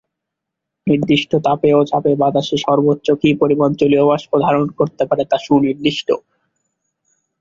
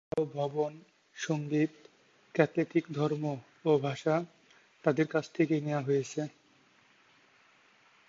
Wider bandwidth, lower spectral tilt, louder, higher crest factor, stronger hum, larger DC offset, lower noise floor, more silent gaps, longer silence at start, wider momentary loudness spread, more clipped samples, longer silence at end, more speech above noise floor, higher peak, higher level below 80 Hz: about the same, 7.6 kHz vs 7.8 kHz; about the same, -7 dB/octave vs -6.5 dB/octave; first, -15 LUFS vs -32 LUFS; second, 14 dB vs 22 dB; neither; neither; first, -80 dBFS vs -65 dBFS; neither; first, 0.85 s vs 0.15 s; second, 5 LU vs 9 LU; neither; second, 1.2 s vs 1.8 s; first, 65 dB vs 34 dB; first, -2 dBFS vs -10 dBFS; first, -54 dBFS vs -76 dBFS